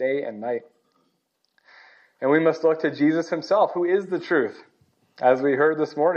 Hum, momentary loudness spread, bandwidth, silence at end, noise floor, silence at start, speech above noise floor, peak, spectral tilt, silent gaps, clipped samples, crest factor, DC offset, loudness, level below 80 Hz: none; 9 LU; 7 kHz; 0 s; -72 dBFS; 0 s; 51 dB; -6 dBFS; -7 dB/octave; none; under 0.1%; 18 dB; under 0.1%; -22 LUFS; -84 dBFS